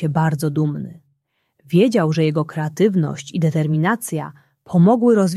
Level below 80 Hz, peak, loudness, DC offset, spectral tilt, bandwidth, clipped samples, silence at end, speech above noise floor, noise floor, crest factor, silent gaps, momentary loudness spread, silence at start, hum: -60 dBFS; -4 dBFS; -18 LUFS; under 0.1%; -7 dB/octave; 13.5 kHz; under 0.1%; 0 s; 51 dB; -68 dBFS; 14 dB; none; 11 LU; 0 s; none